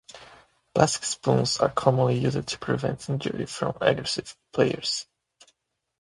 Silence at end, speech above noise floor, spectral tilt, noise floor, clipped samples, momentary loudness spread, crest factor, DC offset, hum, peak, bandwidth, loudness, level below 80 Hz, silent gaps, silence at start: 0.95 s; 43 dB; -4.5 dB/octave; -68 dBFS; under 0.1%; 9 LU; 26 dB; under 0.1%; none; 0 dBFS; 11.5 kHz; -25 LUFS; -56 dBFS; none; 0.15 s